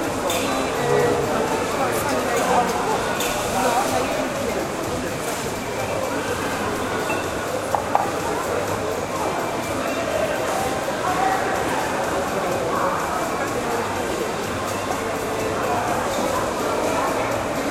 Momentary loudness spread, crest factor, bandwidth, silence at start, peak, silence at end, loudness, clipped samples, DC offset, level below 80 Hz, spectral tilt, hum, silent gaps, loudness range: 5 LU; 22 dB; 16 kHz; 0 s; 0 dBFS; 0 s; -23 LUFS; under 0.1%; under 0.1%; -46 dBFS; -4 dB/octave; none; none; 3 LU